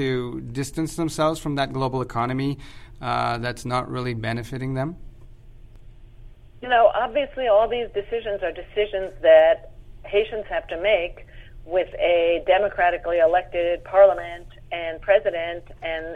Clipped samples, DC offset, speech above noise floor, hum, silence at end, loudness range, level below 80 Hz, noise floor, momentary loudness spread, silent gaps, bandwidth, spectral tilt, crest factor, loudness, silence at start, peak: under 0.1%; under 0.1%; 22 dB; none; 0 s; 8 LU; -44 dBFS; -44 dBFS; 13 LU; none; 13 kHz; -5.5 dB/octave; 18 dB; -22 LUFS; 0 s; -4 dBFS